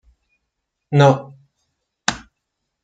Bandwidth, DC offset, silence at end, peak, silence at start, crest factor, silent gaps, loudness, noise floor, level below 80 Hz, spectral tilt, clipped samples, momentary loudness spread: 9.2 kHz; under 0.1%; 0.65 s; 0 dBFS; 0.9 s; 22 dB; none; -18 LUFS; -77 dBFS; -54 dBFS; -5.5 dB/octave; under 0.1%; 11 LU